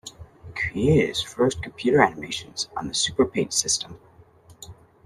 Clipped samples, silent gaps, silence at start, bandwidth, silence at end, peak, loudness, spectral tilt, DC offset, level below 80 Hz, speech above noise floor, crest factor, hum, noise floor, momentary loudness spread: under 0.1%; none; 0.05 s; 13.5 kHz; 0.35 s; -2 dBFS; -23 LUFS; -3.5 dB/octave; under 0.1%; -50 dBFS; 29 dB; 22 dB; none; -52 dBFS; 18 LU